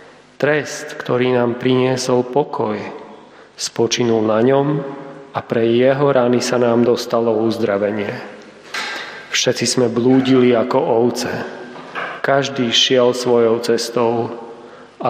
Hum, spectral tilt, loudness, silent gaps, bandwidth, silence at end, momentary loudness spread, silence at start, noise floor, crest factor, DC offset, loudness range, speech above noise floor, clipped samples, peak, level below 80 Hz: none; -4.5 dB/octave; -17 LUFS; none; 15.5 kHz; 0 s; 14 LU; 0.4 s; -41 dBFS; 16 dB; under 0.1%; 3 LU; 25 dB; under 0.1%; -2 dBFS; -64 dBFS